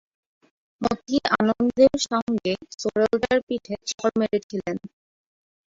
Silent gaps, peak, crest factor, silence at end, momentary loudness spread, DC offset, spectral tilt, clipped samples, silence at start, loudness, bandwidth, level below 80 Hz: 2.22-2.27 s, 3.43-3.47 s, 4.43-4.50 s; -4 dBFS; 20 dB; 0.8 s; 11 LU; under 0.1%; -4.5 dB/octave; under 0.1%; 0.8 s; -23 LUFS; 7.8 kHz; -56 dBFS